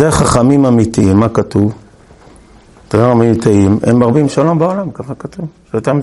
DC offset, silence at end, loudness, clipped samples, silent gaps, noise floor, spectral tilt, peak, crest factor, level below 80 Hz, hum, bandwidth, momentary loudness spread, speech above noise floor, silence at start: under 0.1%; 0 s; -11 LUFS; 0.1%; none; -41 dBFS; -7 dB/octave; 0 dBFS; 12 dB; -36 dBFS; none; 12 kHz; 14 LU; 30 dB; 0 s